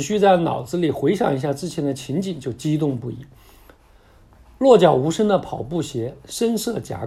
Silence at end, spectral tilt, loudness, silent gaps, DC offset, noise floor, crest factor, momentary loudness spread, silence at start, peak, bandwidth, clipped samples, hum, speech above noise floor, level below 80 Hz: 0 s; -6 dB/octave; -20 LUFS; none; under 0.1%; -51 dBFS; 20 dB; 13 LU; 0 s; 0 dBFS; 14.5 kHz; under 0.1%; none; 31 dB; -52 dBFS